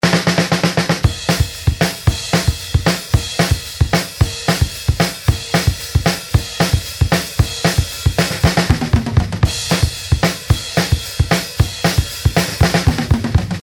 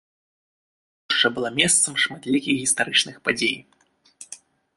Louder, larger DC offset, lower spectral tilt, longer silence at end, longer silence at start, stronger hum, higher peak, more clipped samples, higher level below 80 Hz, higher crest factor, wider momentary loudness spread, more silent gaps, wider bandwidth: first, -16 LUFS vs -20 LUFS; neither; first, -4.5 dB/octave vs -1.5 dB/octave; second, 0 s vs 0.4 s; second, 0.05 s vs 1.1 s; neither; about the same, 0 dBFS vs -2 dBFS; neither; first, -24 dBFS vs -64 dBFS; second, 16 dB vs 24 dB; second, 3 LU vs 16 LU; neither; first, 17.5 kHz vs 12 kHz